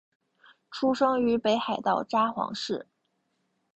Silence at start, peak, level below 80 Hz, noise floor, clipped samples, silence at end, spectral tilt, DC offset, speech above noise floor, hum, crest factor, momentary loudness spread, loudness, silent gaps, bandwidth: 0.7 s; -12 dBFS; -68 dBFS; -76 dBFS; under 0.1%; 0.95 s; -5 dB/octave; under 0.1%; 49 dB; none; 16 dB; 9 LU; -27 LUFS; none; 8.4 kHz